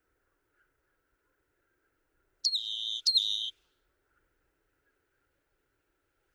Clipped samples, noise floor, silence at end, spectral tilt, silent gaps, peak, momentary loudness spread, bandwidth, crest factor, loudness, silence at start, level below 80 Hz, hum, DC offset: under 0.1%; -78 dBFS; 2.85 s; 4 dB/octave; none; -14 dBFS; 8 LU; over 20 kHz; 26 dB; -29 LUFS; 2.45 s; -82 dBFS; none; under 0.1%